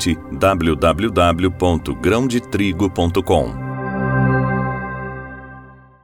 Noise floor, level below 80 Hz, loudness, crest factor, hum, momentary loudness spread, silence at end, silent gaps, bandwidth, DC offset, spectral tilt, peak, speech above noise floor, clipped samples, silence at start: -41 dBFS; -34 dBFS; -18 LUFS; 16 dB; none; 12 LU; 0.3 s; none; 17 kHz; under 0.1%; -6 dB/octave; -4 dBFS; 24 dB; under 0.1%; 0 s